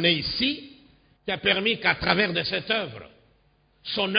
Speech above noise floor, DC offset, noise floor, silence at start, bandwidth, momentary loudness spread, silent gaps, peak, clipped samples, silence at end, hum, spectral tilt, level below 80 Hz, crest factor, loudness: 38 dB; under 0.1%; -63 dBFS; 0 s; 5.2 kHz; 15 LU; none; -4 dBFS; under 0.1%; 0 s; none; -8.5 dB/octave; -52 dBFS; 22 dB; -24 LUFS